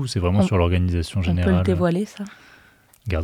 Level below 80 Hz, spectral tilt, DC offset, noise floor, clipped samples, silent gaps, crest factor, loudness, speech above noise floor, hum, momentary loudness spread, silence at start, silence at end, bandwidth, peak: -40 dBFS; -7 dB/octave; under 0.1%; -54 dBFS; under 0.1%; none; 16 dB; -21 LUFS; 33 dB; none; 15 LU; 0 s; 0 s; 11 kHz; -6 dBFS